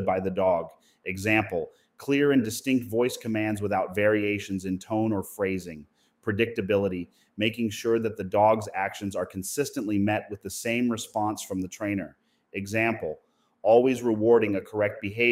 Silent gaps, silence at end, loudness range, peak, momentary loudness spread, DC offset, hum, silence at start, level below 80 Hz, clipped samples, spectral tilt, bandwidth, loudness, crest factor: none; 0 s; 4 LU; -8 dBFS; 14 LU; under 0.1%; none; 0 s; -64 dBFS; under 0.1%; -5.5 dB/octave; 16 kHz; -27 LUFS; 20 dB